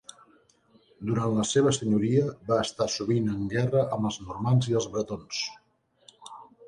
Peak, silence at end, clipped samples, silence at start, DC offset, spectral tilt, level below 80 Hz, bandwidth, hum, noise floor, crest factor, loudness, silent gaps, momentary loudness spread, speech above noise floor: -10 dBFS; 0 s; under 0.1%; 1 s; under 0.1%; -5.5 dB/octave; -58 dBFS; 11 kHz; none; -62 dBFS; 18 dB; -27 LUFS; none; 9 LU; 36 dB